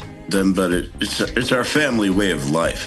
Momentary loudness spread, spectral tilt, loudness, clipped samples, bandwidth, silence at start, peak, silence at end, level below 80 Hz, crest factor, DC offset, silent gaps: 5 LU; -4.5 dB/octave; -19 LUFS; under 0.1%; 12.5 kHz; 0 s; -4 dBFS; 0 s; -38 dBFS; 16 dB; under 0.1%; none